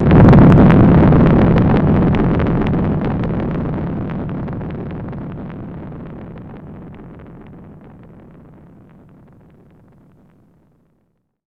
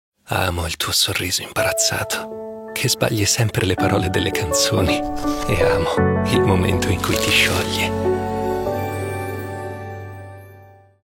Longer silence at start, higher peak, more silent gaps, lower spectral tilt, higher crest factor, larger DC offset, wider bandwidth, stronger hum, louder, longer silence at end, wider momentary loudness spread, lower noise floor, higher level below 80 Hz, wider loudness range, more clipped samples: second, 0 s vs 0.3 s; about the same, 0 dBFS vs -2 dBFS; neither; first, -10.5 dB/octave vs -4 dB/octave; about the same, 14 dB vs 18 dB; neither; second, 5.2 kHz vs 16.5 kHz; neither; first, -13 LUFS vs -19 LUFS; first, 3.9 s vs 0.35 s; first, 25 LU vs 12 LU; first, -65 dBFS vs -46 dBFS; first, -26 dBFS vs -38 dBFS; first, 25 LU vs 3 LU; neither